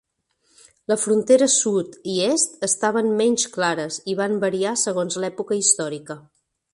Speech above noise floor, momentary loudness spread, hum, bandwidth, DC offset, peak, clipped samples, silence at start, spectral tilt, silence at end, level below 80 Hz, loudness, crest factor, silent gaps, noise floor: 47 dB; 10 LU; none; 11.5 kHz; under 0.1%; -4 dBFS; under 0.1%; 0.9 s; -3 dB/octave; 0.55 s; -68 dBFS; -20 LUFS; 18 dB; none; -67 dBFS